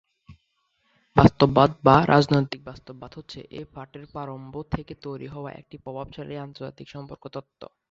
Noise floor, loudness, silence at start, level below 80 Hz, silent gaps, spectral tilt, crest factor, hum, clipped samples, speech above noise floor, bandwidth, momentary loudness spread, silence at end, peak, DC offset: -72 dBFS; -20 LUFS; 0.3 s; -46 dBFS; none; -7.5 dB/octave; 24 dB; none; under 0.1%; 48 dB; 7.8 kHz; 23 LU; 0.25 s; -2 dBFS; under 0.1%